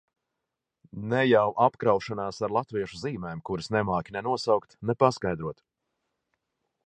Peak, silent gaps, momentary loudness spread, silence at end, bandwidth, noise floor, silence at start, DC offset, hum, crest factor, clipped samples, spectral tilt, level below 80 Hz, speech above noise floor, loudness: -6 dBFS; none; 12 LU; 1.3 s; 9.6 kHz; -85 dBFS; 0.95 s; under 0.1%; none; 22 dB; under 0.1%; -6.5 dB/octave; -58 dBFS; 59 dB; -27 LUFS